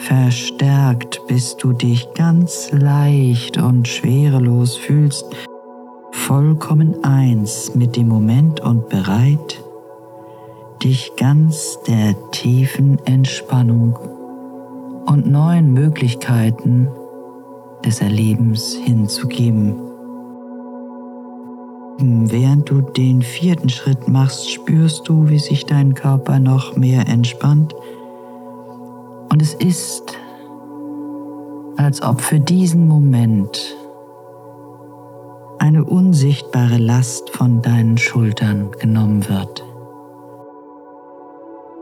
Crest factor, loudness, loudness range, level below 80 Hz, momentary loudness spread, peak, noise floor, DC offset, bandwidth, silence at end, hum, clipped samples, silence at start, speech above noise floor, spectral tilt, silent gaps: 12 dB; -15 LUFS; 5 LU; -64 dBFS; 20 LU; -4 dBFS; -39 dBFS; under 0.1%; 15 kHz; 0 s; none; under 0.1%; 0 s; 25 dB; -6.5 dB/octave; none